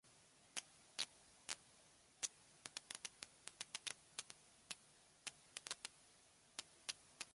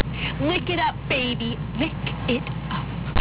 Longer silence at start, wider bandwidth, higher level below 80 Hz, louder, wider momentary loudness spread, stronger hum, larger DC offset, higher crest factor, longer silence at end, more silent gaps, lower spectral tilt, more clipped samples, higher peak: about the same, 0.05 s vs 0 s; first, 11.5 kHz vs 4 kHz; second, -86 dBFS vs -36 dBFS; second, -52 LUFS vs -25 LUFS; first, 19 LU vs 6 LU; neither; neither; first, 34 dB vs 12 dB; about the same, 0 s vs 0 s; neither; second, 1 dB/octave vs -10 dB/octave; neither; second, -22 dBFS vs -12 dBFS